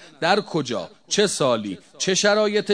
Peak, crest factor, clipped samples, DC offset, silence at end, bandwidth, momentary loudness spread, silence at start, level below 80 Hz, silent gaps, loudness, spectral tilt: -2 dBFS; 20 dB; under 0.1%; 0.1%; 0 s; 11 kHz; 10 LU; 0 s; -68 dBFS; none; -21 LUFS; -3 dB/octave